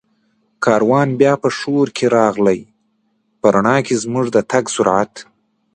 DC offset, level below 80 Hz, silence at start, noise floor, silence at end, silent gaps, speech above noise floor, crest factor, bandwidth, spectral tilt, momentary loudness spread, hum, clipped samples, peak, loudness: under 0.1%; -56 dBFS; 0.6 s; -64 dBFS; 0.5 s; none; 49 dB; 16 dB; 9.8 kHz; -5.5 dB/octave; 5 LU; none; under 0.1%; 0 dBFS; -16 LUFS